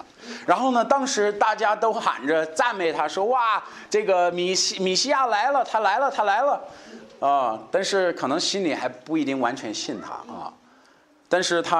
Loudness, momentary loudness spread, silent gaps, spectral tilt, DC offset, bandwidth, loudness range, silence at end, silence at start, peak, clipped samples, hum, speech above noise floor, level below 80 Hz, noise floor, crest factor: -23 LUFS; 10 LU; none; -2.5 dB/octave; under 0.1%; 12.5 kHz; 4 LU; 0 s; 0.2 s; -6 dBFS; under 0.1%; none; 34 dB; -72 dBFS; -57 dBFS; 18 dB